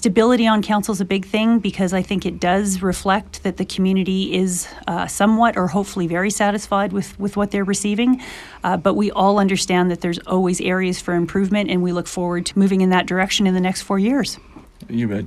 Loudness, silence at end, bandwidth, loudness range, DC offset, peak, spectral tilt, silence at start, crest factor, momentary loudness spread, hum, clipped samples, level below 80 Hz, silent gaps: -19 LUFS; 0 s; 13.5 kHz; 2 LU; under 0.1%; -2 dBFS; -5 dB/octave; 0 s; 16 dB; 7 LU; none; under 0.1%; -44 dBFS; none